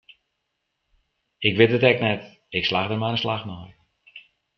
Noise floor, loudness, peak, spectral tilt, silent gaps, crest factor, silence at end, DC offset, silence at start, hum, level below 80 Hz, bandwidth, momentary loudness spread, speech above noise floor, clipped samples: -78 dBFS; -22 LUFS; -2 dBFS; -7 dB/octave; none; 22 dB; 0.4 s; under 0.1%; 1.4 s; none; -60 dBFS; 6.2 kHz; 13 LU; 56 dB; under 0.1%